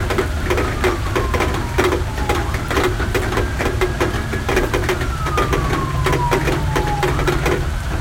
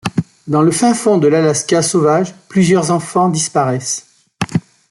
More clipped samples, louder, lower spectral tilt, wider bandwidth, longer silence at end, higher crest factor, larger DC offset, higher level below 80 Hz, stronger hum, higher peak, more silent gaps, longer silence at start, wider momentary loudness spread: neither; second, -19 LUFS vs -14 LUFS; about the same, -5.5 dB/octave vs -5 dB/octave; first, 17 kHz vs 12 kHz; second, 0 s vs 0.3 s; first, 18 dB vs 12 dB; neither; first, -24 dBFS vs -52 dBFS; neither; about the same, 0 dBFS vs -2 dBFS; neither; about the same, 0 s vs 0.05 s; second, 3 LU vs 9 LU